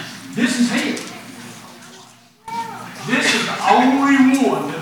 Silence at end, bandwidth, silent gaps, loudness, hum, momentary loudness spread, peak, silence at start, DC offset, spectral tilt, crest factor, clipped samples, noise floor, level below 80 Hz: 0 s; 18 kHz; none; -17 LUFS; none; 22 LU; 0 dBFS; 0 s; under 0.1%; -3.5 dB/octave; 18 dB; under 0.1%; -46 dBFS; -66 dBFS